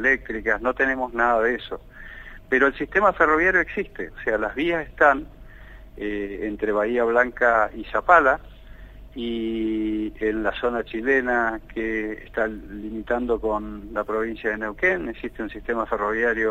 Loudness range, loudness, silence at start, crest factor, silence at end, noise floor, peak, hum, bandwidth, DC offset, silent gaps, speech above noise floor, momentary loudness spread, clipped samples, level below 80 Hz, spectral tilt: 5 LU; -23 LUFS; 0 s; 22 dB; 0 s; -43 dBFS; -2 dBFS; none; 13.5 kHz; under 0.1%; none; 20 dB; 14 LU; under 0.1%; -44 dBFS; -6 dB/octave